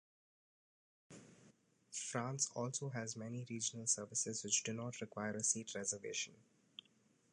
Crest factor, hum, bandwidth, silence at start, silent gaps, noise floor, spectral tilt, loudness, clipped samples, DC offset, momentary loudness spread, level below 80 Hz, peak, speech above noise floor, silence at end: 22 dB; none; 11 kHz; 1.1 s; none; -74 dBFS; -2.5 dB/octave; -41 LUFS; under 0.1%; under 0.1%; 21 LU; -84 dBFS; -22 dBFS; 32 dB; 0.9 s